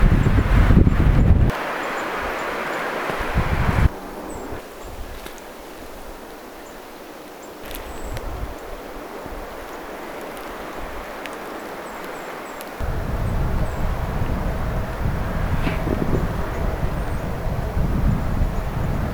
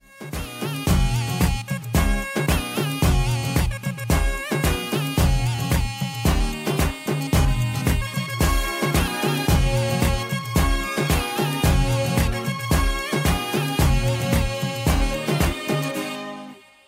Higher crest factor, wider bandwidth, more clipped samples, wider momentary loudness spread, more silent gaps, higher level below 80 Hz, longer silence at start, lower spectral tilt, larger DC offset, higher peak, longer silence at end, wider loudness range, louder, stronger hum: first, 22 dB vs 16 dB; first, over 20 kHz vs 16 kHz; neither; first, 19 LU vs 6 LU; neither; about the same, -26 dBFS vs -26 dBFS; second, 0 s vs 0.15 s; first, -7 dB/octave vs -5 dB/octave; neither; first, 0 dBFS vs -6 dBFS; second, 0 s vs 0.3 s; first, 14 LU vs 1 LU; about the same, -24 LUFS vs -23 LUFS; neither